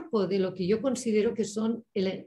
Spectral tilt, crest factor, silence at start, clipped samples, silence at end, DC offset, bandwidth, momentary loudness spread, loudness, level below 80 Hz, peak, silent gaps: -6 dB/octave; 14 dB; 0 s; under 0.1%; 0 s; under 0.1%; 12 kHz; 4 LU; -29 LUFS; -66 dBFS; -14 dBFS; none